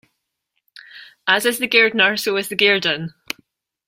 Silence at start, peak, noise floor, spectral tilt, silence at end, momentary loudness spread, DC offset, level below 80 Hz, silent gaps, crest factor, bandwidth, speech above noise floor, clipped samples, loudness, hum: 0.95 s; -2 dBFS; -75 dBFS; -2.5 dB/octave; 0.8 s; 17 LU; under 0.1%; -66 dBFS; none; 20 dB; 16 kHz; 57 dB; under 0.1%; -16 LUFS; none